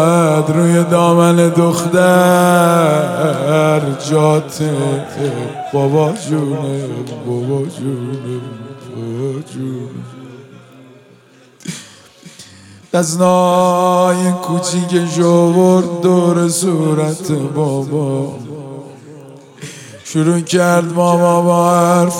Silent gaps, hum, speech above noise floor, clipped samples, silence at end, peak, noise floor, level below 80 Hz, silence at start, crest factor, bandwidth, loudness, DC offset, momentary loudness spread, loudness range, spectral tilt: none; none; 32 dB; under 0.1%; 0 s; 0 dBFS; -45 dBFS; -64 dBFS; 0 s; 14 dB; 16.5 kHz; -14 LUFS; under 0.1%; 18 LU; 15 LU; -6 dB/octave